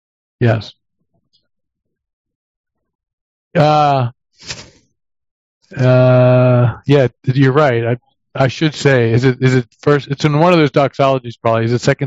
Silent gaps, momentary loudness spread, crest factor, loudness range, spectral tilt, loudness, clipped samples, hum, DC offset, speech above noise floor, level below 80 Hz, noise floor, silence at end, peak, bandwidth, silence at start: 2.13-2.25 s, 2.35-2.64 s, 2.95-2.99 s, 3.13-3.51 s, 5.31-5.61 s; 13 LU; 14 dB; 7 LU; -7 dB/octave; -13 LUFS; under 0.1%; none; under 0.1%; 51 dB; -50 dBFS; -63 dBFS; 0 s; 0 dBFS; 8 kHz; 0.4 s